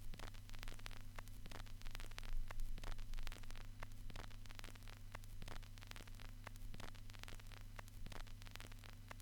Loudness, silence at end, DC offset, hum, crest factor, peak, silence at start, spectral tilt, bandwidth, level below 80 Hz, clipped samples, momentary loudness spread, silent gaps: -56 LUFS; 0 s; under 0.1%; none; 22 dB; -26 dBFS; 0 s; -4 dB/octave; 18.5 kHz; -50 dBFS; under 0.1%; 4 LU; none